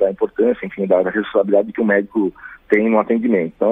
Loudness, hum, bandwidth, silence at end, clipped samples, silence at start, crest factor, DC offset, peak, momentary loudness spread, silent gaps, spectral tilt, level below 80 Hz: -17 LUFS; none; 3.8 kHz; 0 s; under 0.1%; 0 s; 16 dB; under 0.1%; -2 dBFS; 5 LU; none; -9 dB/octave; -56 dBFS